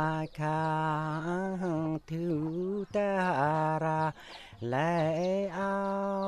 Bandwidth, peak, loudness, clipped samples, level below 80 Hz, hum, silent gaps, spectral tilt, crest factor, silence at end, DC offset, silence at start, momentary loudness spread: 11 kHz; -16 dBFS; -31 LUFS; under 0.1%; -62 dBFS; none; none; -7.5 dB/octave; 16 dB; 0 s; under 0.1%; 0 s; 6 LU